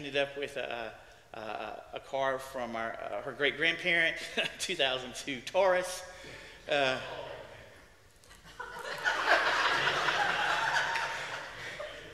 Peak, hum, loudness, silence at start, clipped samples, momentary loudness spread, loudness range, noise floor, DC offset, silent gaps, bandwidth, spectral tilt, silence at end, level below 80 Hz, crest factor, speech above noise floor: -12 dBFS; none; -31 LUFS; 0 s; under 0.1%; 17 LU; 7 LU; -58 dBFS; under 0.1%; none; 15 kHz; -2 dB/octave; 0 s; -64 dBFS; 22 dB; 25 dB